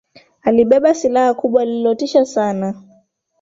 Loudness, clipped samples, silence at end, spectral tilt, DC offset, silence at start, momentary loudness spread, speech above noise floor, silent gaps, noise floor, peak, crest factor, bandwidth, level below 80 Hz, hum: -16 LUFS; under 0.1%; 0.6 s; -5.5 dB/octave; under 0.1%; 0.45 s; 10 LU; 41 dB; none; -55 dBFS; -2 dBFS; 14 dB; 7.8 kHz; -58 dBFS; none